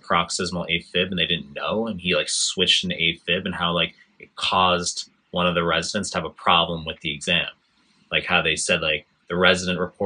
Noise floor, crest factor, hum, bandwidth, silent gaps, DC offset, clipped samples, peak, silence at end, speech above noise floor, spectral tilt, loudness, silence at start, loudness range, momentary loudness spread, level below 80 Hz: -62 dBFS; 22 dB; none; 11 kHz; none; under 0.1%; under 0.1%; 0 dBFS; 0 s; 39 dB; -3 dB/octave; -22 LUFS; 0.05 s; 2 LU; 9 LU; -56 dBFS